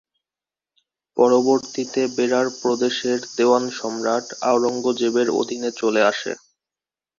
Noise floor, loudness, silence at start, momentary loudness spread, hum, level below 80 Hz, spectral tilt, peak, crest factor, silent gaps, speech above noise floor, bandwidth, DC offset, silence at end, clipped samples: under -90 dBFS; -20 LUFS; 1.15 s; 8 LU; none; -68 dBFS; -3.5 dB/octave; -4 dBFS; 18 dB; none; over 70 dB; 7.6 kHz; under 0.1%; 0.8 s; under 0.1%